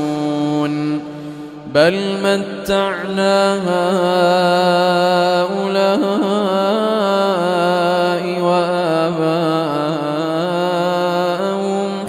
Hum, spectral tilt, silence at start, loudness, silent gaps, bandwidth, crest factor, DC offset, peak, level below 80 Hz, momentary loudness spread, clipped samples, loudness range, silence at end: none; -5.5 dB/octave; 0 s; -16 LUFS; none; 15.5 kHz; 16 dB; under 0.1%; -2 dBFS; -56 dBFS; 6 LU; under 0.1%; 3 LU; 0 s